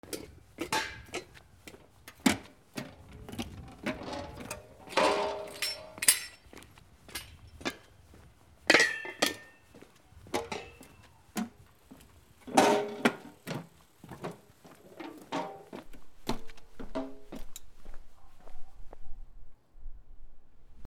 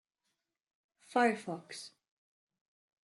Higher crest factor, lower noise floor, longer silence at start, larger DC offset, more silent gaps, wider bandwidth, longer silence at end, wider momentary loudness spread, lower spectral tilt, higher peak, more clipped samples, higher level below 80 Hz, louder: first, 32 dB vs 22 dB; second, -58 dBFS vs -85 dBFS; second, 0.05 s vs 1.1 s; neither; neither; first, 19.5 kHz vs 12 kHz; second, 0 s vs 1.2 s; first, 27 LU vs 17 LU; second, -2.5 dB/octave vs -4.5 dB/octave; first, -4 dBFS vs -16 dBFS; neither; first, -52 dBFS vs -88 dBFS; about the same, -32 LUFS vs -34 LUFS